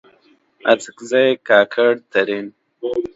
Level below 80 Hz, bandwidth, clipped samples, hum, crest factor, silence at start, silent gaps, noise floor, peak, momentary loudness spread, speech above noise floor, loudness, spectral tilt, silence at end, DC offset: -64 dBFS; 8 kHz; under 0.1%; none; 18 dB; 0.65 s; none; -56 dBFS; 0 dBFS; 12 LU; 39 dB; -17 LUFS; -4 dB/octave; 0.1 s; under 0.1%